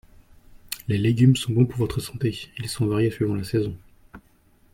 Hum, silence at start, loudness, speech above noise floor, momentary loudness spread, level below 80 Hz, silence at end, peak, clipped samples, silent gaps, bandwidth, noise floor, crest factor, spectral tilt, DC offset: none; 0.7 s; -23 LUFS; 36 dB; 14 LU; -50 dBFS; 0.55 s; -6 dBFS; under 0.1%; none; 16.5 kHz; -58 dBFS; 18 dB; -6.5 dB/octave; under 0.1%